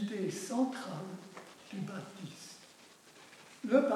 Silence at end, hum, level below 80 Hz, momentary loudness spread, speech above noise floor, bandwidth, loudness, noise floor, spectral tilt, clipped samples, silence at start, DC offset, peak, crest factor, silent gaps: 0 s; none; -90 dBFS; 22 LU; 25 dB; 14.5 kHz; -38 LUFS; -59 dBFS; -5.5 dB/octave; under 0.1%; 0 s; under 0.1%; -14 dBFS; 22 dB; none